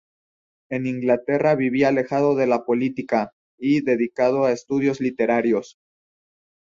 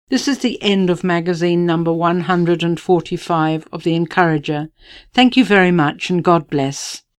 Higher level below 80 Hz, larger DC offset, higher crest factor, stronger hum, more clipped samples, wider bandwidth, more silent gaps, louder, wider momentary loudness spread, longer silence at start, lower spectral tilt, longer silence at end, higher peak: second, -64 dBFS vs -52 dBFS; neither; about the same, 16 dB vs 16 dB; neither; neither; second, 7.4 kHz vs 12.5 kHz; first, 3.33-3.58 s vs none; second, -21 LUFS vs -16 LUFS; about the same, 6 LU vs 8 LU; first, 0.7 s vs 0.1 s; first, -7 dB/octave vs -5.5 dB/octave; first, 0.95 s vs 0.2 s; second, -6 dBFS vs 0 dBFS